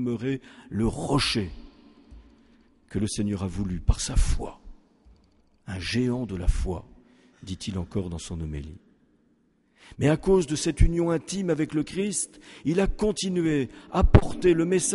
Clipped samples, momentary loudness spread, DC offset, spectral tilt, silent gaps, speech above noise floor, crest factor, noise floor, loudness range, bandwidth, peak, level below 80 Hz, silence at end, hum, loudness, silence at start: under 0.1%; 13 LU; under 0.1%; -5.5 dB/octave; none; 41 dB; 24 dB; -65 dBFS; 7 LU; 11.5 kHz; -2 dBFS; -32 dBFS; 0 s; none; -27 LUFS; 0 s